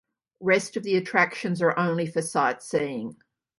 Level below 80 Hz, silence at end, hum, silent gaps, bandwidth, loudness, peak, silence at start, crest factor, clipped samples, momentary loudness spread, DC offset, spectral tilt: -72 dBFS; 0.45 s; none; none; 11.5 kHz; -25 LUFS; -4 dBFS; 0.4 s; 22 dB; under 0.1%; 8 LU; under 0.1%; -5 dB/octave